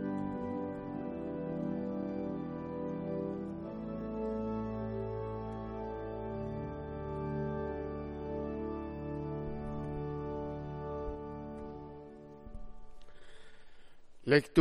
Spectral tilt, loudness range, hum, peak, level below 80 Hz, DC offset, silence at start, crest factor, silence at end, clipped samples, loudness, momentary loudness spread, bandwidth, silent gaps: -8 dB/octave; 5 LU; none; -12 dBFS; -52 dBFS; under 0.1%; 0 s; 26 dB; 0 s; under 0.1%; -39 LUFS; 10 LU; 12 kHz; none